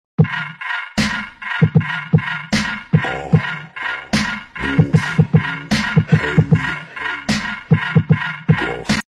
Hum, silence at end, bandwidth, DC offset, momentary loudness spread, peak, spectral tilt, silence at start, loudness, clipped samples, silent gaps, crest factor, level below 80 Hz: none; 0.05 s; 12 kHz; under 0.1%; 9 LU; -4 dBFS; -6 dB/octave; 0.2 s; -18 LUFS; under 0.1%; none; 14 dB; -40 dBFS